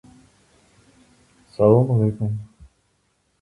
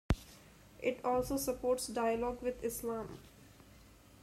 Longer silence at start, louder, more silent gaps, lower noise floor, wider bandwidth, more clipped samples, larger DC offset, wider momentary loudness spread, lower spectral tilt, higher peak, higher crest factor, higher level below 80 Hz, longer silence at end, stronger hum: first, 1.6 s vs 0.1 s; first, -19 LUFS vs -37 LUFS; neither; first, -67 dBFS vs -60 dBFS; second, 10.5 kHz vs 16 kHz; neither; neither; about the same, 16 LU vs 15 LU; first, -11 dB/octave vs -5 dB/octave; first, -2 dBFS vs -18 dBFS; about the same, 22 dB vs 20 dB; about the same, -52 dBFS vs -50 dBFS; first, 0.95 s vs 0.3 s; neither